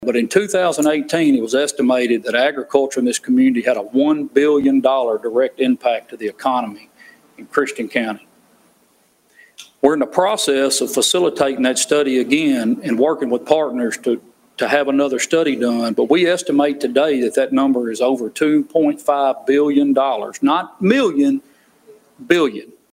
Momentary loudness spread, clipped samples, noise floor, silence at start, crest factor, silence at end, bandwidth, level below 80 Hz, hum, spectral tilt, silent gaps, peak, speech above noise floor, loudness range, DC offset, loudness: 6 LU; under 0.1%; -58 dBFS; 0 s; 18 dB; 0.25 s; 16 kHz; -64 dBFS; none; -3.5 dB/octave; none; 0 dBFS; 41 dB; 5 LU; under 0.1%; -17 LUFS